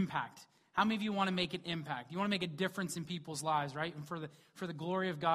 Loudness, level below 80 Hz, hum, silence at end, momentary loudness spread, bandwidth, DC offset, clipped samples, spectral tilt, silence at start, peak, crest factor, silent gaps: -37 LUFS; -72 dBFS; none; 0 s; 11 LU; 15 kHz; under 0.1%; under 0.1%; -5 dB/octave; 0 s; -16 dBFS; 20 dB; none